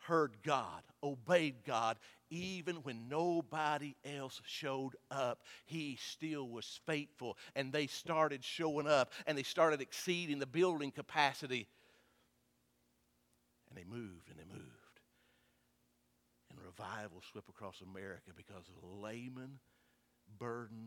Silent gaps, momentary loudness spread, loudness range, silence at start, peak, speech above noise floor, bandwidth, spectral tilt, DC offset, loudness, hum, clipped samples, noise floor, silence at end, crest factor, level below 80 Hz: none; 21 LU; 21 LU; 0 s; -16 dBFS; 38 dB; 17 kHz; -4.5 dB/octave; under 0.1%; -39 LUFS; 60 Hz at -80 dBFS; under 0.1%; -78 dBFS; 0 s; 26 dB; -82 dBFS